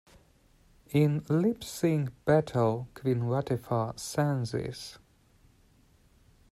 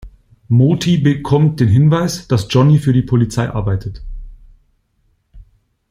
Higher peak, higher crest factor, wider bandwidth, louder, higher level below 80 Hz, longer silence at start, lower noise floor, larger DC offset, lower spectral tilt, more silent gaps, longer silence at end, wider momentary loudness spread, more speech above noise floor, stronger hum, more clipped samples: second, -10 dBFS vs -2 dBFS; first, 20 dB vs 14 dB; about the same, 14.5 kHz vs 14.5 kHz; second, -29 LUFS vs -14 LUFS; second, -60 dBFS vs -36 dBFS; first, 0.9 s vs 0.05 s; about the same, -63 dBFS vs -61 dBFS; neither; about the same, -7 dB/octave vs -7 dB/octave; neither; first, 1.55 s vs 0.5 s; about the same, 8 LU vs 10 LU; second, 34 dB vs 48 dB; neither; neither